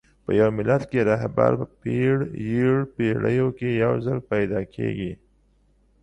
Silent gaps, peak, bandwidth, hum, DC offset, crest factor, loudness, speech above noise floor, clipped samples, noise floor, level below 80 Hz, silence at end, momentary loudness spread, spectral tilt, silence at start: none; -6 dBFS; 8.8 kHz; none; under 0.1%; 18 dB; -23 LUFS; 39 dB; under 0.1%; -61 dBFS; -50 dBFS; 0.9 s; 7 LU; -9 dB/octave; 0.3 s